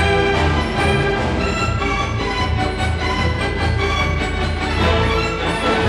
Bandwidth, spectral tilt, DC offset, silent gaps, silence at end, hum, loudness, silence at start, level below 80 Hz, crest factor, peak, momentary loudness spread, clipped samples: 11.5 kHz; -5.5 dB/octave; under 0.1%; none; 0 s; none; -18 LUFS; 0 s; -26 dBFS; 16 dB; -2 dBFS; 4 LU; under 0.1%